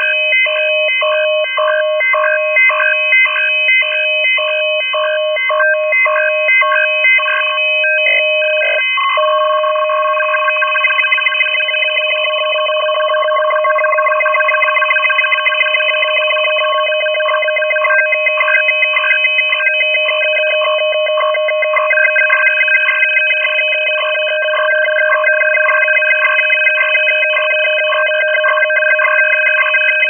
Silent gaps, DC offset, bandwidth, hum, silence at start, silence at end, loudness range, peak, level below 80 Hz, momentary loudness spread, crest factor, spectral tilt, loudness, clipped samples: none; under 0.1%; 3.5 kHz; none; 0 s; 0 s; 2 LU; -2 dBFS; under -90 dBFS; 4 LU; 12 dB; 3 dB/octave; -11 LUFS; under 0.1%